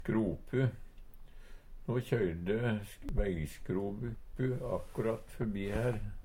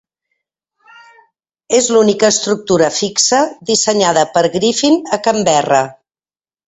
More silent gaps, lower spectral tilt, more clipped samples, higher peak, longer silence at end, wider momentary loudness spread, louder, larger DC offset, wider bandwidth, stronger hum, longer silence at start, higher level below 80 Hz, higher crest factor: neither; first, -8 dB/octave vs -3 dB/octave; neither; second, -18 dBFS vs 0 dBFS; second, 0 s vs 0.75 s; about the same, 6 LU vs 4 LU; second, -36 LUFS vs -13 LUFS; neither; first, 16.5 kHz vs 8.4 kHz; neither; second, 0 s vs 1.7 s; first, -44 dBFS vs -54 dBFS; about the same, 18 dB vs 14 dB